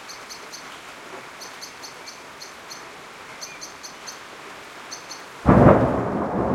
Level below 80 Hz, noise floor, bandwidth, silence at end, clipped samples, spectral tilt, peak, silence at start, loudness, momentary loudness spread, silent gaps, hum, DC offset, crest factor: -40 dBFS; -40 dBFS; 15.5 kHz; 0 s; under 0.1%; -6.5 dB/octave; 0 dBFS; 0 s; -18 LUFS; 23 LU; none; none; under 0.1%; 24 dB